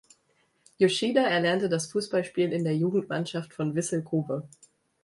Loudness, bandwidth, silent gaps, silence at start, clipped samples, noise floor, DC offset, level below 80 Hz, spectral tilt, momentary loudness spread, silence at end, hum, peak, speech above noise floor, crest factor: -27 LUFS; 11.5 kHz; none; 0.8 s; under 0.1%; -69 dBFS; under 0.1%; -70 dBFS; -5 dB/octave; 8 LU; 0.55 s; none; -10 dBFS; 43 dB; 18 dB